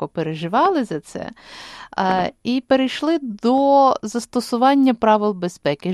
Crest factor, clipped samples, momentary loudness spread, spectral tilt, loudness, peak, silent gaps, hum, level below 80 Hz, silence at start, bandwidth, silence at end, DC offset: 16 dB; under 0.1%; 16 LU; -5.5 dB/octave; -19 LUFS; -2 dBFS; none; none; -58 dBFS; 0 s; 13 kHz; 0 s; under 0.1%